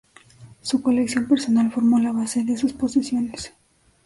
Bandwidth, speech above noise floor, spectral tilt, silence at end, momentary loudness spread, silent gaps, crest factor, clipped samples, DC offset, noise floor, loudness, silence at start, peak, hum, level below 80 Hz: 11.5 kHz; 27 dB; -4.5 dB/octave; 0.55 s; 11 LU; none; 14 dB; under 0.1%; under 0.1%; -47 dBFS; -21 LUFS; 0.4 s; -8 dBFS; none; -56 dBFS